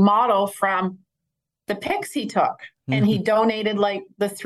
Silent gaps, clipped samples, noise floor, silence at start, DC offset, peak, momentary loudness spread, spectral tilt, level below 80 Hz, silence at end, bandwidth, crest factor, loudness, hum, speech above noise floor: none; under 0.1%; -82 dBFS; 0 s; under 0.1%; -4 dBFS; 10 LU; -6 dB/octave; -66 dBFS; 0 s; 12.5 kHz; 16 dB; -22 LUFS; none; 60 dB